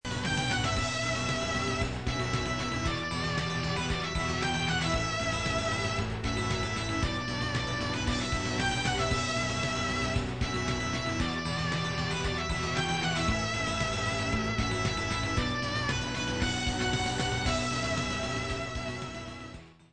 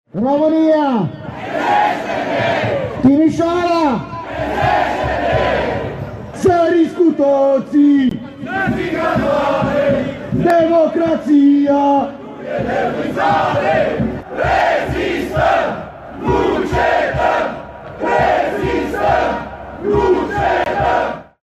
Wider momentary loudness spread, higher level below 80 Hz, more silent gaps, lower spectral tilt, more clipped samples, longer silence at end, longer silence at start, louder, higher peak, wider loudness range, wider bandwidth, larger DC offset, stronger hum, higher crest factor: second, 3 LU vs 11 LU; about the same, -42 dBFS vs -38 dBFS; neither; second, -4 dB/octave vs -7 dB/octave; neither; second, 0 s vs 0.2 s; second, 0 s vs 0.15 s; second, -30 LUFS vs -15 LUFS; second, -16 dBFS vs -4 dBFS; about the same, 1 LU vs 3 LU; second, 11 kHz vs 12.5 kHz; first, 0.2% vs under 0.1%; neither; about the same, 16 dB vs 12 dB